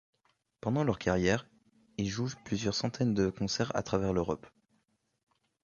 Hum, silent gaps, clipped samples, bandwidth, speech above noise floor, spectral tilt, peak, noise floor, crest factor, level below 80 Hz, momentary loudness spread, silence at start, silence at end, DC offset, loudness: none; none; under 0.1%; 7.4 kHz; 45 dB; -5.5 dB/octave; -12 dBFS; -76 dBFS; 20 dB; -54 dBFS; 7 LU; 0.65 s; 1.15 s; under 0.1%; -32 LUFS